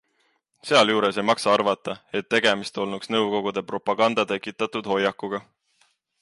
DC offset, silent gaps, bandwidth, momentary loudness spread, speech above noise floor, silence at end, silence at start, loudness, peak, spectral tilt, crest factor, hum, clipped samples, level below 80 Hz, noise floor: under 0.1%; none; 11.5 kHz; 10 LU; 46 dB; 0.8 s; 0.65 s; -23 LUFS; -6 dBFS; -4 dB/octave; 18 dB; none; under 0.1%; -68 dBFS; -69 dBFS